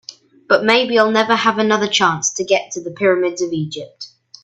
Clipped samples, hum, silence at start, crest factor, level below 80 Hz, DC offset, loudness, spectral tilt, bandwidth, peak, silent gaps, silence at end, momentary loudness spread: under 0.1%; none; 0.1 s; 18 dB; -62 dBFS; under 0.1%; -16 LUFS; -3 dB/octave; 9.2 kHz; 0 dBFS; none; 0.35 s; 15 LU